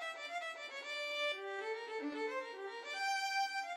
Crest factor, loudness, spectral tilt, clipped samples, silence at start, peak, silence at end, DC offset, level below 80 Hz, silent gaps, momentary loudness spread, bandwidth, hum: 14 dB; -40 LUFS; 0.5 dB/octave; under 0.1%; 0 s; -28 dBFS; 0 s; under 0.1%; under -90 dBFS; none; 7 LU; 16 kHz; none